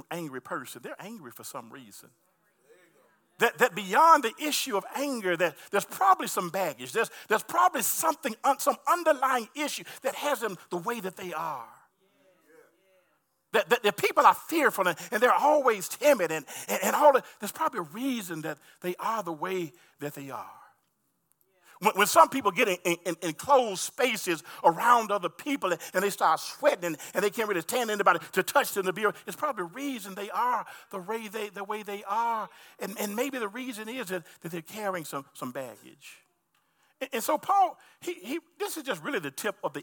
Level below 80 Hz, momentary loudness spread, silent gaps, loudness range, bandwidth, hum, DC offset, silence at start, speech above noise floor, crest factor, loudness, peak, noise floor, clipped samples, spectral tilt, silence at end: -86 dBFS; 16 LU; none; 10 LU; 18 kHz; none; under 0.1%; 0.1 s; 47 dB; 24 dB; -27 LUFS; -6 dBFS; -75 dBFS; under 0.1%; -3 dB/octave; 0 s